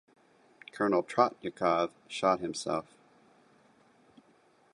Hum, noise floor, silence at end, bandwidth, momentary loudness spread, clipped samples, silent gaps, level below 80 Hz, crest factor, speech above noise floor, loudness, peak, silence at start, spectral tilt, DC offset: none; -65 dBFS; 1.9 s; 11.5 kHz; 8 LU; under 0.1%; none; -72 dBFS; 24 dB; 35 dB; -31 LUFS; -10 dBFS; 0.75 s; -4.5 dB/octave; under 0.1%